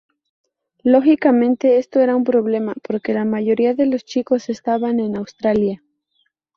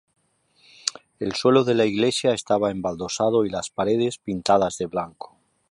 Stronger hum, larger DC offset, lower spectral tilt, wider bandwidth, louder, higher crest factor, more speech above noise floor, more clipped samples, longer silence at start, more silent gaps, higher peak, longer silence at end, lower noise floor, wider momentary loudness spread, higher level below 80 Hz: neither; neither; first, -7 dB/octave vs -4.5 dB/octave; second, 7 kHz vs 11.5 kHz; first, -18 LUFS vs -23 LUFS; second, 16 dB vs 22 dB; first, 50 dB vs 40 dB; neither; about the same, 0.85 s vs 0.85 s; neither; about the same, -2 dBFS vs -2 dBFS; first, 0.8 s vs 0.45 s; first, -67 dBFS vs -62 dBFS; about the same, 9 LU vs 10 LU; about the same, -60 dBFS vs -56 dBFS